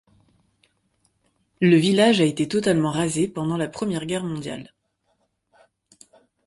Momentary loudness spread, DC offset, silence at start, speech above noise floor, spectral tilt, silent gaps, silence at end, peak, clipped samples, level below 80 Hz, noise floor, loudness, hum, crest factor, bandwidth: 12 LU; under 0.1%; 1.6 s; 50 dB; -5.5 dB/octave; none; 1.8 s; -4 dBFS; under 0.1%; -60 dBFS; -70 dBFS; -21 LUFS; none; 20 dB; 11.5 kHz